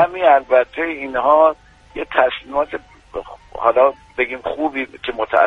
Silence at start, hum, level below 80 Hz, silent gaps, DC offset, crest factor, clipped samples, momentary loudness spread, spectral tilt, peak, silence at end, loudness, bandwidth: 0 s; none; -50 dBFS; none; under 0.1%; 18 dB; under 0.1%; 18 LU; -5.5 dB/octave; 0 dBFS; 0 s; -17 LUFS; 5.6 kHz